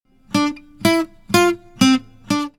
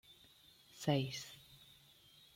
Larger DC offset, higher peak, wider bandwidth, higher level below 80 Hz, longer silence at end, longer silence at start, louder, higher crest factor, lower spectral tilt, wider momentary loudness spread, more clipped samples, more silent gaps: neither; first, 0 dBFS vs -22 dBFS; first, 19 kHz vs 16.5 kHz; first, -50 dBFS vs -76 dBFS; second, 0.1 s vs 0.7 s; first, 0.35 s vs 0.1 s; first, -19 LUFS vs -40 LUFS; about the same, 18 dB vs 22 dB; second, -4 dB/octave vs -5.5 dB/octave; second, 7 LU vs 25 LU; neither; neither